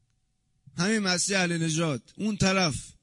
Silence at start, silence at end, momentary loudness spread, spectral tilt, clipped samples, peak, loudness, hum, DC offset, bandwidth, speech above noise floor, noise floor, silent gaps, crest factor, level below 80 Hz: 0.75 s; 0.1 s; 8 LU; -4 dB/octave; under 0.1%; -12 dBFS; -26 LUFS; none; under 0.1%; 11 kHz; 46 dB; -72 dBFS; none; 16 dB; -54 dBFS